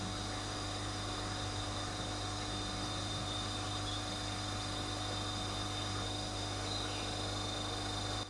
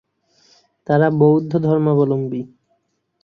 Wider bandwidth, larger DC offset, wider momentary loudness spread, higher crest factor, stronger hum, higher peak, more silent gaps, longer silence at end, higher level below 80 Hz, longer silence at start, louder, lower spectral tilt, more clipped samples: first, 11.5 kHz vs 6.2 kHz; neither; second, 1 LU vs 16 LU; about the same, 12 dB vs 16 dB; first, 50 Hz at -45 dBFS vs none; second, -26 dBFS vs -2 dBFS; neither; second, 0 s vs 0.75 s; first, -50 dBFS vs -60 dBFS; second, 0 s vs 0.9 s; second, -38 LUFS vs -17 LUFS; second, -3.5 dB/octave vs -10.5 dB/octave; neither